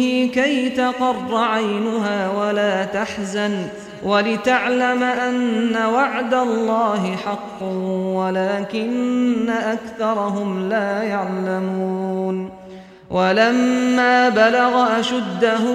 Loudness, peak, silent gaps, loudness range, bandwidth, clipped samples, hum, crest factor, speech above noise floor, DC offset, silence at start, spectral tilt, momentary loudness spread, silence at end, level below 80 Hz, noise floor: -19 LUFS; -4 dBFS; none; 4 LU; 10.5 kHz; under 0.1%; none; 16 dB; 20 dB; under 0.1%; 0 s; -5.5 dB/octave; 8 LU; 0 s; -58 dBFS; -39 dBFS